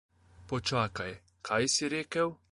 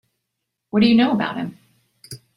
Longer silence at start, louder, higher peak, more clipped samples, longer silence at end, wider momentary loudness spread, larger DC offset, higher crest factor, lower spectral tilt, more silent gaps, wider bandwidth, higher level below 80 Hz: second, 0.4 s vs 0.75 s; second, -32 LUFS vs -18 LUFS; second, -14 dBFS vs -4 dBFS; neither; about the same, 0.2 s vs 0.2 s; second, 12 LU vs 23 LU; neither; about the same, 20 dB vs 16 dB; second, -3.5 dB/octave vs -6.5 dB/octave; neither; about the same, 11.5 kHz vs 12.5 kHz; about the same, -60 dBFS vs -58 dBFS